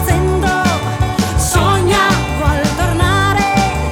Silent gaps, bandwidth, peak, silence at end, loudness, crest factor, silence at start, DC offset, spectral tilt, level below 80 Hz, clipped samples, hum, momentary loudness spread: none; 19 kHz; -2 dBFS; 0 s; -14 LUFS; 12 dB; 0 s; under 0.1%; -5 dB/octave; -22 dBFS; under 0.1%; none; 4 LU